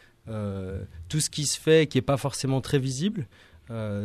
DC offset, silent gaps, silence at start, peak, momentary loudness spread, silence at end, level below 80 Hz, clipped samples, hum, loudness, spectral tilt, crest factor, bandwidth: under 0.1%; none; 0.25 s; -10 dBFS; 16 LU; 0 s; -52 dBFS; under 0.1%; none; -26 LUFS; -5 dB/octave; 18 dB; 14 kHz